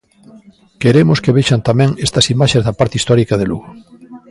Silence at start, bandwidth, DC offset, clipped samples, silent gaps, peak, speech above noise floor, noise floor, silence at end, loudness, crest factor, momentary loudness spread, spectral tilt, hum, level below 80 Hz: 0.35 s; 11.5 kHz; under 0.1%; under 0.1%; none; 0 dBFS; 29 dB; -42 dBFS; 0.15 s; -13 LUFS; 14 dB; 6 LU; -5.5 dB/octave; none; -40 dBFS